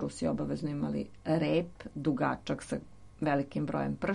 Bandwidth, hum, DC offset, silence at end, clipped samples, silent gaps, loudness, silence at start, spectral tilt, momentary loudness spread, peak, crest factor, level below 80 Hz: 11 kHz; none; under 0.1%; 0 s; under 0.1%; none; -33 LUFS; 0 s; -7 dB/octave; 6 LU; -16 dBFS; 16 dB; -58 dBFS